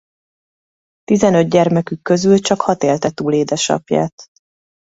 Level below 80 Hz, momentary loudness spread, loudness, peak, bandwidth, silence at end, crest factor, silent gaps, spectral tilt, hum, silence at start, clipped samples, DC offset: -54 dBFS; 6 LU; -15 LUFS; 0 dBFS; 8 kHz; 0.6 s; 16 dB; 4.12-4.18 s; -5.5 dB/octave; none; 1.1 s; under 0.1%; under 0.1%